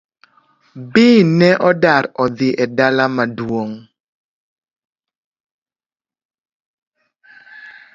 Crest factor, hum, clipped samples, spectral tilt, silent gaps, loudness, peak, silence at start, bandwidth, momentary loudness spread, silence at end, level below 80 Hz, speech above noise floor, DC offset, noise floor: 18 dB; none; under 0.1%; -7 dB/octave; 4.00-4.56 s, 4.85-4.93 s, 5.18-5.32 s, 5.40-5.66 s, 6.25-6.29 s, 6.40-6.45 s, 6.53-6.91 s; -14 LUFS; 0 dBFS; 0.75 s; 7.6 kHz; 12 LU; 0.25 s; -58 dBFS; over 76 dB; under 0.1%; under -90 dBFS